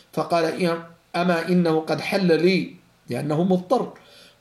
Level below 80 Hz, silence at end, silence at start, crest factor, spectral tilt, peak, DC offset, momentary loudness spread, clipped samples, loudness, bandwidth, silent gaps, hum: -68 dBFS; 0.45 s; 0.15 s; 16 dB; -6.5 dB/octave; -8 dBFS; under 0.1%; 12 LU; under 0.1%; -22 LUFS; 12.5 kHz; none; none